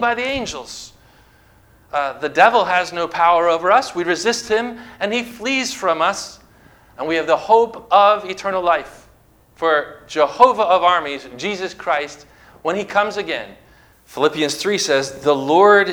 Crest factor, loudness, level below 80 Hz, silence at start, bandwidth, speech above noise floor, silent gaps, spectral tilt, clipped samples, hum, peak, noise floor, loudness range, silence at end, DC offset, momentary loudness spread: 18 dB; -17 LUFS; -54 dBFS; 0 s; 20 kHz; 35 dB; none; -3 dB/octave; under 0.1%; none; 0 dBFS; -52 dBFS; 4 LU; 0 s; under 0.1%; 14 LU